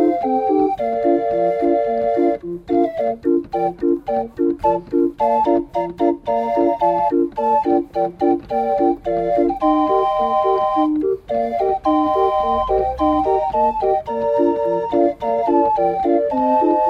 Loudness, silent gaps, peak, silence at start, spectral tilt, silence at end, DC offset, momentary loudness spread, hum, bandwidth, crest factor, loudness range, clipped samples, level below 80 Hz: -18 LUFS; none; -4 dBFS; 0 s; -8 dB/octave; 0 s; under 0.1%; 4 LU; none; 6.2 kHz; 14 dB; 2 LU; under 0.1%; -44 dBFS